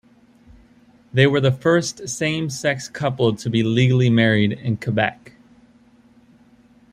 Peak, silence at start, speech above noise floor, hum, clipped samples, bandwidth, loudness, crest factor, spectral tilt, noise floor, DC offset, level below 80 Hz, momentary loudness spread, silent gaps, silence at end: -2 dBFS; 1.15 s; 34 dB; none; under 0.1%; 13.5 kHz; -19 LUFS; 18 dB; -5.5 dB/octave; -53 dBFS; under 0.1%; -56 dBFS; 8 LU; none; 1.8 s